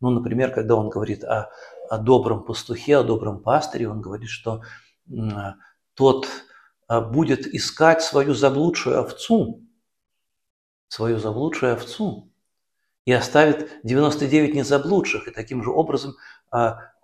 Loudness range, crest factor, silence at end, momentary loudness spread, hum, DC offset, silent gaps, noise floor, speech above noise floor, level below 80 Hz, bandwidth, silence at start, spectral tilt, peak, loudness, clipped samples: 6 LU; 22 dB; 0.15 s; 13 LU; none; under 0.1%; 10.50-10.88 s, 12.99-13.05 s; -78 dBFS; 58 dB; -52 dBFS; 14 kHz; 0 s; -6 dB/octave; 0 dBFS; -21 LUFS; under 0.1%